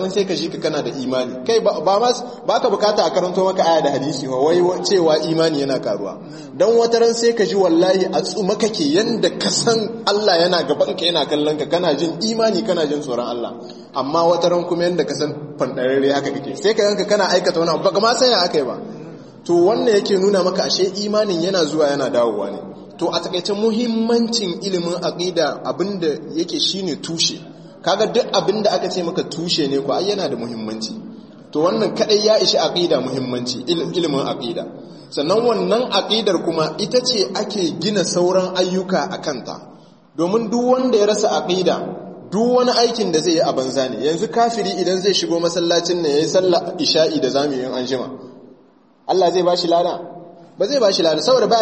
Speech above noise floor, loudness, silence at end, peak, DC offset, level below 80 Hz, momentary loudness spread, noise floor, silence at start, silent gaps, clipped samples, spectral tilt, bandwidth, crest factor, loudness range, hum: 34 dB; -18 LUFS; 0 s; -2 dBFS; under 0.1%; -64 dBFS; 10 LU; -51 dBFS; 0 s; none; under 0.1%; -4 dB/octave; 8.8 kHz; 16 dB; 3 LU; none